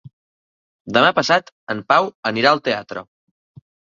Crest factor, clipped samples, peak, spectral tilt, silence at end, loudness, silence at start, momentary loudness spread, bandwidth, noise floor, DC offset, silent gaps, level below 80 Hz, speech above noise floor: 20 dB; under 0.1%; -2 dBFS; -4 dB/octave; 0.95 s; -18 LUFS; 0.05 s; 13 LU; 7.6 kHz; under -90 dBFS; under 0.1%; 0.13-0.85 s, 1.52-1.67 s, 2.15-2.23 s; -62 dBFS; over 72 dB